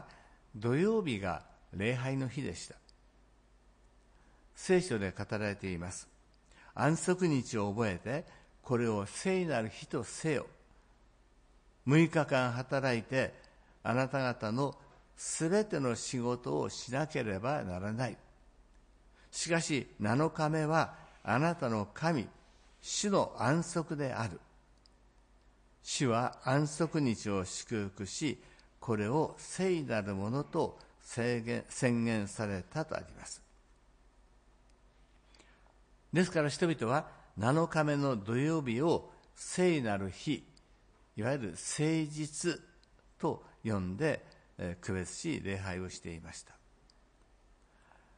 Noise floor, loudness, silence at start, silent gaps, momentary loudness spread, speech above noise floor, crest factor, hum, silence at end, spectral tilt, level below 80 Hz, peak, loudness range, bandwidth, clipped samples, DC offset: -65 dBFS; -34 LUFS; 0 s; none; 12 LU; 32 dB; 20 dB; none; 1.75 s; -5.5 dB/octave; -64 dBFS; -16 dBFS; 6 LU; 10.5 kHz; under 0.1%; under 0.1%